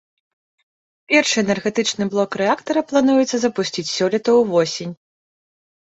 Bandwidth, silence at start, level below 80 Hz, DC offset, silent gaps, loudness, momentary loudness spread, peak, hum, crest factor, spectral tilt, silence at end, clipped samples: 8.2 kHz; 1.1 s; -62 dBFS; under 0.1%; none; -18 LUFS; 7 LU; -2 dBFS; none; 18 dB; -4 dB/octave; 0.9 s; under 0.1%